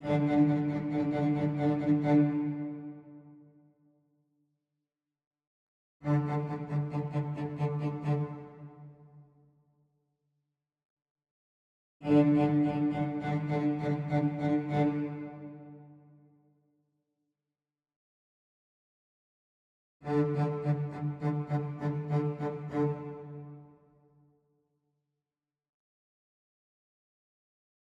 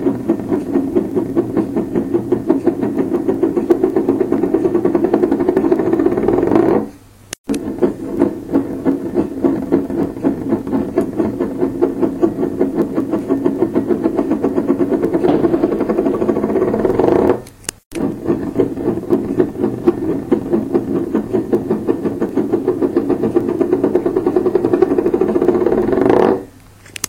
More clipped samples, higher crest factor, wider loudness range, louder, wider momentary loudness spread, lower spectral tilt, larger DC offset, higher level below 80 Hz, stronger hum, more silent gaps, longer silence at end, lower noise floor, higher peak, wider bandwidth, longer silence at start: neither; about the same, 20 dB vs 16 dB; first, 12 LU vs 3 LU; second, -31 LUFS vs -16 LUFS; first, 19 LU vs 5 LU; first, -10 dB/octave vs -7.5 dB/octave; neither; second, -68 dBFS vs -42 dBFS; neither; first, 5.27-5.31 s, 5.47-6.00 s, 10.85-10.97 s, 11.10-11.16 s, 11.31-12.00 s, 17.96-20.00 s vs 7.38-7.44 s, 17.85-17.91 s; first, 4.35 s vs 0 s; first, under -90 dBFS vs -41 dBFS; second, -14 dBFS vs 0 dBFS; second, 5.8 kHz vs 16.5 kHz; about the same, 0 s vs 0 s